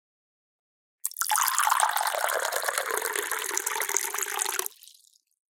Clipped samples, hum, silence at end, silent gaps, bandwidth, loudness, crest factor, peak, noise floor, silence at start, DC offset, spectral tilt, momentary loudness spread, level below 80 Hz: under 0.1%; none; 0.7 s; none; 17 kHz; -26 LUFS; 28 dB; -2 dBFS; -60 dBFS; 1.05 s; under 0.1%; 3 dB/octave; 7 LU; -84 dBFS